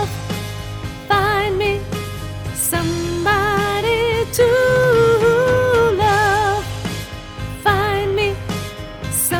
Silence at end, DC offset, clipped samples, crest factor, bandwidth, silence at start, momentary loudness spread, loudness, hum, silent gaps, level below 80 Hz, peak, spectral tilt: 0 s; under 0.1%; under 0.1%; 14 dB; over 20 kHz; 0 s; 14 LU; -17 LUFS; none; none; -36 dBFS; -4 dBFS; -4 dB/octave